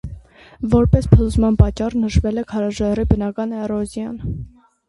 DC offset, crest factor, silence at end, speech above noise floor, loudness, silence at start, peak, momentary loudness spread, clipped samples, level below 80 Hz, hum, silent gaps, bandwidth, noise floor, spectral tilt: under 0.1%; 18 dB; 0.4 s; 22 dB; -18 LUFS; 0.05 s; 0 dBFS; 15 LU; under 0.1%; -26 dBFS; none; none; 11.5 kHz; -39 dBFS; -8.5 dB/octave